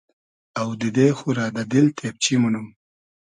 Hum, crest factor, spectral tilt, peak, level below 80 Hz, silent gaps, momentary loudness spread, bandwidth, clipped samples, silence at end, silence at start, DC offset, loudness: none; 18 dB; -5 dB/octave; -4 dBFS; -64 dBFS; none; 10 LU; 11 kHz; under 0.1%; 0.55 s; 0.55 s; under 0.1%; -21 LUFS